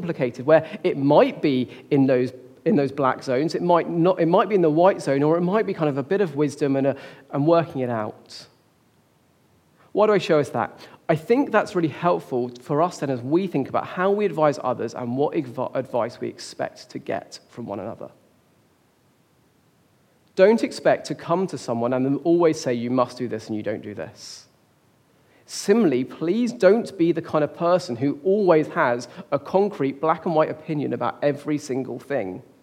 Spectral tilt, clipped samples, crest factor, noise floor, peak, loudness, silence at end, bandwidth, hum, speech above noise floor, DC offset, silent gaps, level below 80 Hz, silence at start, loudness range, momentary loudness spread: -6.5 dB/octave; under 0.1%; 20 dB; -61 dBFS; -2 dBFS; -22 LUFS; 0.2 s; 14 kHz; none; 39 dB; under 0.1%; none; -72 dBFS; 0 s; 8 LU; 13 LU